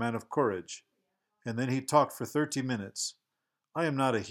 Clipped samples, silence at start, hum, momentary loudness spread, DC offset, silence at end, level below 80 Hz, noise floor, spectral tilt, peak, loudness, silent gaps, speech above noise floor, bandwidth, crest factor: under 0.1%; 0 s; none; 13 LU; under 0.1%; 0 s; -78 dBFS; -86 dBFS; -5 dB/octave; -10 dBFS; -31 LUFS; none; 55 dB; 17 kHz; 22 dB